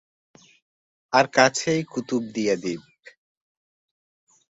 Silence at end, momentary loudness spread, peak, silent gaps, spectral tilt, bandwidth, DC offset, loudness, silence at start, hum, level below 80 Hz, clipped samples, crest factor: 1.7 s; 10 LU; -2 dBFS; none; -4 dB/octave; 8 kHz; under 0.1%; -22 LUFS; 1.1 s; none; -66 dBFS; under 0.1%; 24 dB